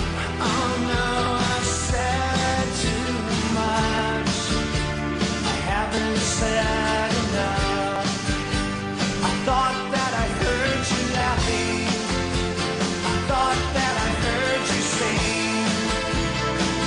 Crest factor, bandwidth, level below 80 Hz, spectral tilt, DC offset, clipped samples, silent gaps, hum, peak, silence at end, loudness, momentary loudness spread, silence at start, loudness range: 14 dB; 11.5 kHz; -34 dBFS; -4 dB/octave; under 0.1%; under 0.1%; none; none; -8 dBFS; 0 s; -23 LUFS; 3 LU; 0 s; 1 LU